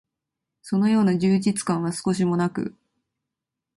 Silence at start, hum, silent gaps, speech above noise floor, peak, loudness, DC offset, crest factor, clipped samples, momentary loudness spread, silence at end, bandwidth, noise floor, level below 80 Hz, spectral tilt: 0.65 s; none; none; 63 dB; -10 dBFS; -23 LUFS; under 0.1%; 14 dB; under 0.1%; 8 LU; 1.1 s; 11.5 kHz; -85 dBFS; -62 dBFS; -6.5 dB/octave